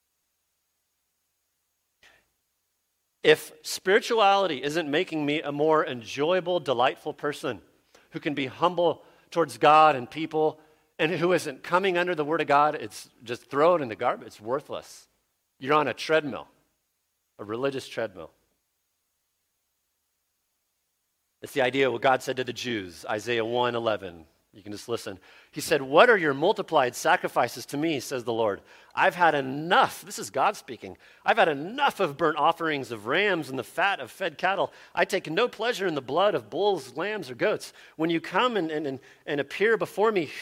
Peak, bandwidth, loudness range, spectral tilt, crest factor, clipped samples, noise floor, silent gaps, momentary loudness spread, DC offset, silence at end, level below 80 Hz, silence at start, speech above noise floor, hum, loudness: -4 dBFS; 16.5 kHz; 7 LU; -4 dB/octave; 24 dB; under 0.1%; -77 dBFS; none; 13 LU; under 0.1%; 0 s; -72 dBFS; 3.25 s; 51 dB; none; -26 LUFS